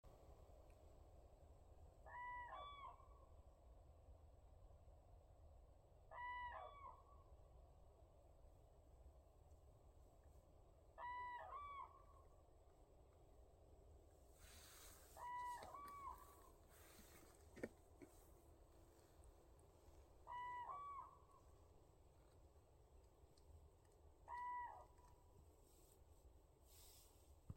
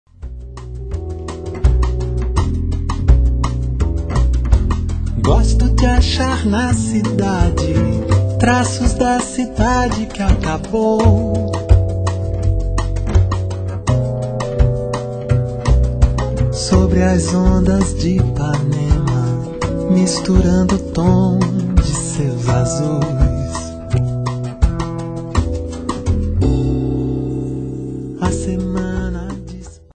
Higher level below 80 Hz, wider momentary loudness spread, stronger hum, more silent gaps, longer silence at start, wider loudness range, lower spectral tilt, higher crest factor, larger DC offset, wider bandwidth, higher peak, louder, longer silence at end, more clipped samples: second, -70 dBFS vs -20 dBFS; first, 17 LU vs 9 LU; neither; neither; second, 0.05 s vs 0.2 s; first, 7 LU vs 4 LU; second, -4.5 dB/octave vs -6.5 dB/octave; first, 24 dB vs 16 dB; neither; first, 16.5 kHz vs 9.2 kHz; second, -36 dBFS vs 0 dBFS; second, -57 LUFS vs -17 LUFS; second, 0 s vs 0.2 s; neither